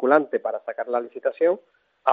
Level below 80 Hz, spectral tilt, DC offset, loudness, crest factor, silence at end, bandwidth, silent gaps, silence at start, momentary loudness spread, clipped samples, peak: -82 dBFS; -7.5 dB/octave; under 0.1%; -25 LUFS; 18 dB; 0 s; 4.6 kHz; none; 0 s; 10 LU; under 0.1%; -4 dBFS